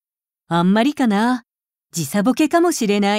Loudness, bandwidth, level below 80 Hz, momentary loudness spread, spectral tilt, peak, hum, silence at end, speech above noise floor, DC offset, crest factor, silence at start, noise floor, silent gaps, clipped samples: -18 LUFS; 16 kHz; -64 dBFS; 9 LU; -5 dB/octave; -4 dBFS; none; 0 s; 54 dB; under 0.1%; 14 dB; 0.5 s; -70 dBFS; none; under 0.1%